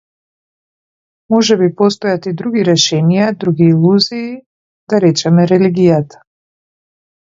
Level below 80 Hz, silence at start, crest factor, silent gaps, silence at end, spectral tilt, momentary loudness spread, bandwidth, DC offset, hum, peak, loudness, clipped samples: -56 dBFS; 1.3 s; 14 dB; 4.46-4.87 s; 1.3 s; -5.5 dB/octave; 7 LU; 7.6 kHz; under 0.1%; none; 0 dBFS; -12 LUFS; under 0.1%